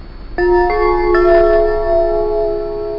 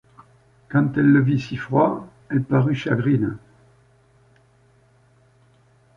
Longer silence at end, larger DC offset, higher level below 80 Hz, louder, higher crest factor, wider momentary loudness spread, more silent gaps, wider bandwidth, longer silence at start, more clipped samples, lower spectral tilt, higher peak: second, 0 s vs 2.6 s; neither; first, -24 dBFS vs -56 dBFS; first, -14 LUFS vs -21 LUFS; second, 10 dB vs 18 dB; about the same, 8 LU vs 10 LU; neither; second, 5.6 kHz vs 7 kHz; second, 0 s vs 0.7 s; neither; about the same, -8.5 dB/octave vs -9 dB/octave; about the same, -2 dBFS vs -4 dBFS